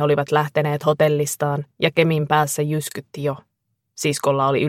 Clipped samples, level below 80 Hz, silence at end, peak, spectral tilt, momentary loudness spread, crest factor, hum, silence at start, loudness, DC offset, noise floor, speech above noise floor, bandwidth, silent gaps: under 0.1%; -62 dBFS; 0 s; -2 dBFS; -5 dB/octave; 9 LU; 18 dB; none; 0 s; -20 LUFS; under 0.1%; -50 dBFS; 30 dB; 16.5 kHz; none